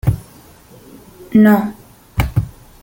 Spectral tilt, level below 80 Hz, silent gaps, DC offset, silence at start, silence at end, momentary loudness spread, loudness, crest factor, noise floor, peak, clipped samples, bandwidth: -8 dB/octave; -32 dBFS; none; under 0.1%; 0.05 s; 0.3 s; 17 LU; -16 LUFS; 16 dB; -43 dBFS; 0 dBFS; under 0.1%; 17 kHz